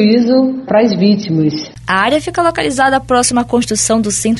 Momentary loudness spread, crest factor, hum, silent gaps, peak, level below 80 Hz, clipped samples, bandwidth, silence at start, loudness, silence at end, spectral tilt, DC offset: 4 LU; 12 dB; none; none; 0 dBFS; -40 dBFS; under 0.1%; 12 kHz; 0 s; -13 LUFS; 0 s; -4 dB/octave; under 0.1%